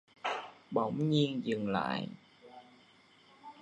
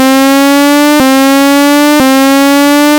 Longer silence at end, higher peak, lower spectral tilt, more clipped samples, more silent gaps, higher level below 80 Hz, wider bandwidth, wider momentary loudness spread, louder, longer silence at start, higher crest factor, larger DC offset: about the same, 0 s vs 0 s; second, -16 dBFS vs 0 dBFS; first, -7 dB/octave vs -2.5 dB/octave; second, under 0.1% vs 1%; neither; second, -72 dBFS vs -42 dBFS; second, 10 kHz vs over 20 kHz; first, 25 LU vs 0 LU; second, -34 LUFS vs -5 LUFS; first, 0.25 s vs 0 s; first, 20 dB vs 6 dB; neither